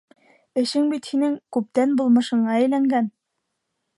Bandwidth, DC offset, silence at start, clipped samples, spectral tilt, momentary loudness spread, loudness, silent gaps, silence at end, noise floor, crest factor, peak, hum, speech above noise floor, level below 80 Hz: 11.5 kHz; under 0.1%; 0.55 s; under 0.1%; -5.5 dB/octave; 7 LU; -21 LUFS; none; 0.9 s; -78 dBFS; 14 dB; -8 dBFS; none; 58 dB; -76 dBFS